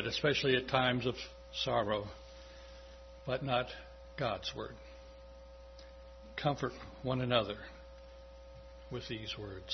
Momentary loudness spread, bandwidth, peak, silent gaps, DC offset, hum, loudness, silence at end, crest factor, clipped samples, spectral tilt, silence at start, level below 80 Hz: 23 LU; 6.2 kHz; -12 dBFS; none; under 0.1%; none; -36 LUFS; 0 s; 26 dB; under 0.1%; -3 dB/octave; 0 s; -56 dBFS